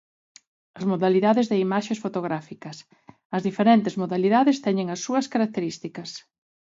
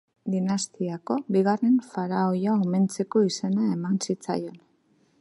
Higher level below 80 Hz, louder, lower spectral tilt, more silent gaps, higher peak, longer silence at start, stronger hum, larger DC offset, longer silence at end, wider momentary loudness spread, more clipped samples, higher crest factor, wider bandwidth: about the same, -72 dBFS vs -74 dBFS; about the same, -23 LUFS vs -25 LUFS; about the same, -6 dB/octave vs -6 dB/octave; first, 3.25-3.30 s vs none; first, -6 dBFS vs -10 dBFS; first, 0.75 s vs 0.25 s; neither; neither; about the same, 0.55 s vs 0.65 s; first, 18 LU vs 8 LU; neither; about the same, 18 dB vs 16 dB; second, 7.8 kHz vs 11.5 kHz